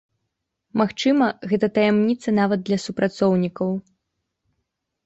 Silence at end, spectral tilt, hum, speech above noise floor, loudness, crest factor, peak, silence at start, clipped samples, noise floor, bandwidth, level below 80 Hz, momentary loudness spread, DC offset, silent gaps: 1.25 s; -6.5 dB/octave; none; 58 dB; -21 LUFS; 16 dB; -6 dBFS; 0.75 s; under 0.1%; -78 dBFS; 8.2 kHz; -62 dBFS; 7 LU; under 0.1%; none